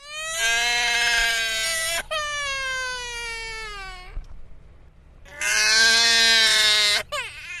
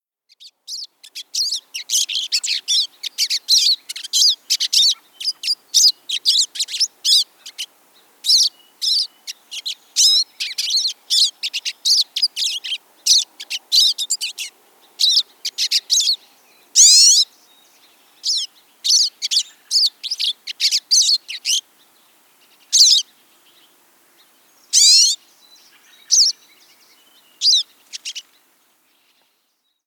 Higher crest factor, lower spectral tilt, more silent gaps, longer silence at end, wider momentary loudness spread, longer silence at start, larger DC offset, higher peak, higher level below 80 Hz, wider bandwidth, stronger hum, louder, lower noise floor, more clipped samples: about the same, 18 dB vs 20 dB; first, 1.5 dB/octave vs 7.5 dB/octave; neither; second, 0 s vs 1.65 s; about the same, 17 LU vs 17 LU; second, 0 s vs 0.45 s; neither; second, -4 dBFS vs 0 dBFS; first, -44 dBFS vs under -90 dBFS; second, 14 kHz vs over 20 kHz; neither; second, -19 LUFS vs -15 LUFS; second, -48 dBFS vs -68 dBFS; neither